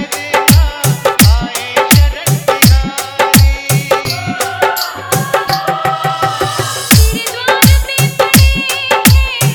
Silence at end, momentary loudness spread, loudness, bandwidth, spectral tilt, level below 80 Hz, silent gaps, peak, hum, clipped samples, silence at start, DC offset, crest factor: 0 s; 7 LU; -11 LUFS; over 20 kHz; -4 dB/octave; -18 dBFS; none; 0 dBFS; none; 0.4%; 0 s; under 0.1%; 10 dB